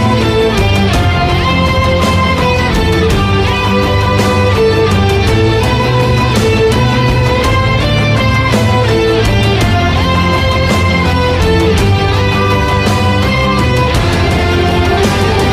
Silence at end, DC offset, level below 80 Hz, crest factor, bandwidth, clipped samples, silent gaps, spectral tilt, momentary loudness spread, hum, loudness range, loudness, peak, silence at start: 0 s; under 0.1%; -20 dBFS; 10 dB; 15.5 kHz; under 0.1%; none; -6 dB/octave; 1 LU; none; 1 LU; -11 LUFS; 0 dBFS; 0 s